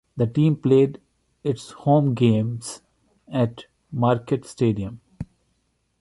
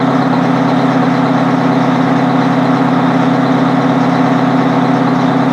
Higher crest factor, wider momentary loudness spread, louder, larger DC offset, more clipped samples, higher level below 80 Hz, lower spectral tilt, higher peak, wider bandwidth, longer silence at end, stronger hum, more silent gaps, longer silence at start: first, 18 dB vs 10 dB; first, 18 LU vs 0 LU; second, -22 LUFS vs -11 LUFS; neither; neither; about the same, -54 dBFS vs -56 dBFS; about the same, -8 dB/octave vs -7.5 dB/octave; second, -6 dBFS vs 0 dBFS; first, 11.5 kHz vs 8.4 kHz; first, 0.75 s vs 0 s; neither; neither; first, 0.15 s vs 0 s